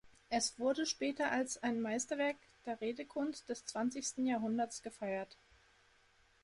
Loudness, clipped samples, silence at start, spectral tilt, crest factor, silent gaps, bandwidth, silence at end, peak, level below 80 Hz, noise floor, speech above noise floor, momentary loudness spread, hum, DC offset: -38 LUFS; under 0.1%; 0.05 s; -3 dB/octave; 16 dB; none; 11.5 kHz; 1.1 s; -22 dBFS; -74 dBFS; -70 dBFS; 32 dB; 8 LU; none; under 0.1%